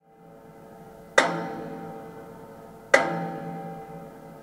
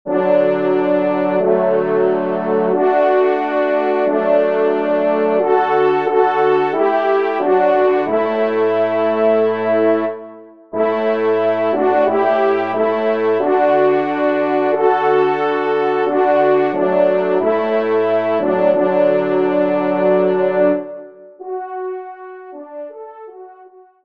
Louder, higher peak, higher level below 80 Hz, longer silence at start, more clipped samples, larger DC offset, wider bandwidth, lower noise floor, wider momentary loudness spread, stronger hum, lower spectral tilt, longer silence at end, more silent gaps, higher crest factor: second, -26 LUFS vs -15 LUFS; about the same, 0 dBFS vs -2 dBFS; about the same, -66 dBFS vs -70 dBFS; first, 0.2 s vs 0.05 s; neither; second, under 0.1% vs 0.4%; first, 16 kHz vs 5.4 kHz; first, -50 dBFS vs -44 dBFS; first, 25 LU vs 11 LU; neither; second, -4 dB/octave vs -8 dB/octave; second, 0 s vs 0.4 s; neither; first, 30 dB vs 14 dB